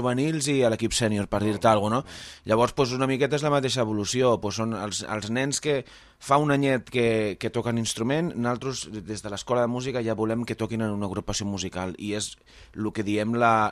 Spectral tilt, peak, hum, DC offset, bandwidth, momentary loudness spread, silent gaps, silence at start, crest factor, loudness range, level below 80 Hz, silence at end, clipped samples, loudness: -5 dB/octave; -6 dBFS; none; under 0.1%; 14.5 kHz; 10 LU; none; 0 s; 18 dB; 4 LU; -52 dBFS; 0 s; under 0.1%; -26 LUFS